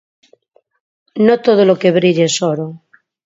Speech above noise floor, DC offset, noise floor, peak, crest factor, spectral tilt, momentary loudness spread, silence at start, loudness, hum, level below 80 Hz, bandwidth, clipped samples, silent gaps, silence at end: 42 dB; under 0.1%; -54 dBFS; 0 dBFS; 14 dB; -5 dB/octave; 13 LU; 1.15 s; -13 LUFS; none; -62 dBFS; 8 kHz; under 0.1%; none; 0.5 s